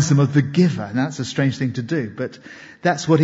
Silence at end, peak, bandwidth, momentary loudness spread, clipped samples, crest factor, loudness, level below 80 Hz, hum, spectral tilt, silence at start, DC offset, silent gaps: 0 s; -4 dBFS; 8 kHz; 13 LU; under 0.1%; 16 dB; -21 LUFS; -60 dBFS; none; -6.5 dB/octave; 0 s; under 0.1%; none